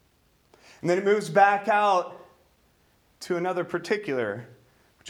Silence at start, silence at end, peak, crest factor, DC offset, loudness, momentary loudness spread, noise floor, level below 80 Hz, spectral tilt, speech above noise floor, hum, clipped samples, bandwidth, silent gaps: 0.85 s; 0 s; -6 dBFS; 20 dB; under 0.1%; -24 LUFS; 13 LU; -64 dBFS; -72 dBFS; -5 dB/octave; 40 dB; none; under 0.1%; 15 kHz; none